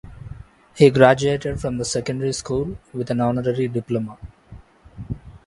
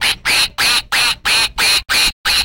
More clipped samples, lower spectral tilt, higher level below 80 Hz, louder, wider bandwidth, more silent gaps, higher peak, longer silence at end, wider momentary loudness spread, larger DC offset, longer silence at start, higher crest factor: neither; first, -6 dB/octave vs 1 dB/octave; second, -44 dBFS vs -36 dBFS; second, -20 LUFS vs -12 LUFS; second, 11.5 kHz vs 17 kHz; second, none vs 2.13-2.24 s; first, 0 dBFS vs -4 dBFS; about the same, 0.1 s vs 0 s; first, 19 LU vs 2 LU; neither; about the same, 0.05 s vs 0 s; first, 22 dB vs 10 dB